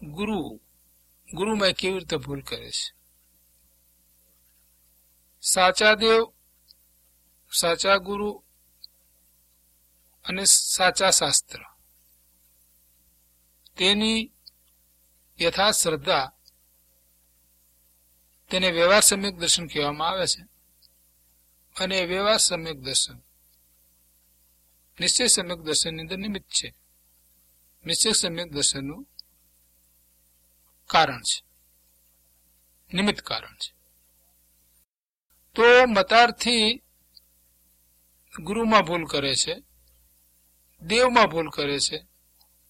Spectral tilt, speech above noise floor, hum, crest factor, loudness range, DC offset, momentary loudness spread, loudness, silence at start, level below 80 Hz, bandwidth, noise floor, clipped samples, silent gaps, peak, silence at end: -1.5 dB/octave; 50 dB; 60 Hz at -60 dBFS; 24 dB; 7 LU; under 0.1%; 17 LU; -22 LUFS; 0 s; -56 dBFS; 16.5 kHz; -73 dBFS; under 0.1%; 34.89-35.14 s, 35.21-35.25 s; -2 dBFS; 0.7 s